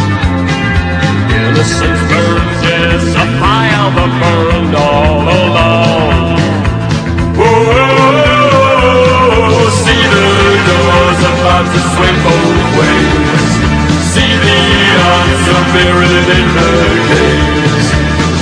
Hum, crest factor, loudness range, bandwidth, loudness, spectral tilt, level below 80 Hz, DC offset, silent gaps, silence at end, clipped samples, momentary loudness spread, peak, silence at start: none; 8 dB; 3 LU; 11 kHz; -8 LUFS; -5 dB/octave; -20 dBFS; under 0.1%; none; 0 s; 0.9%; 4 LU; 0 dBFS; 0 s